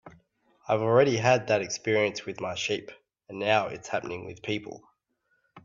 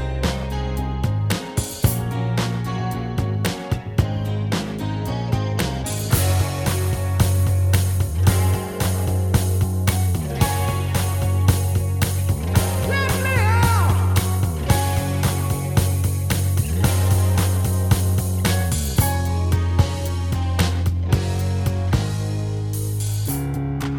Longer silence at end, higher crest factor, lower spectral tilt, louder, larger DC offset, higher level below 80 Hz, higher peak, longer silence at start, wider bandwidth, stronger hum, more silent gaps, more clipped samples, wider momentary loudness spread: about the same, 0.05 s vs 0 s; about the same, 20 dB vs 18 dB; about the same, -4.5 dB/octave vs -5.5 dB/octave; second, -27 LUFS vs -21 LUFS; neither; second, -68 dBFS vs -32 dBFS; second, -8 dBFS vs -2 dBFS; about the same, 0.05 s vs 0 s; second, 7.6 kHz vs 19.5 kHz; neither; neither; neither; first, 14 LU vs 6 LU